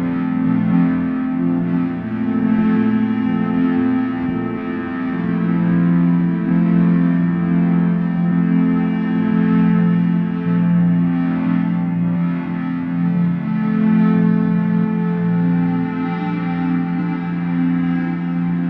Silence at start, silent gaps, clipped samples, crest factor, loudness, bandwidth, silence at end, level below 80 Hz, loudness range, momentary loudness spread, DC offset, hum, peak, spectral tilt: 0 s; none; under 0.1%; 12 dB; -17 LUFS; 4 kHz; 0 s; -50 dBFS; 2 LU; 6 LU; under 0.1%; none; -4 dBFS; -11 dB/octave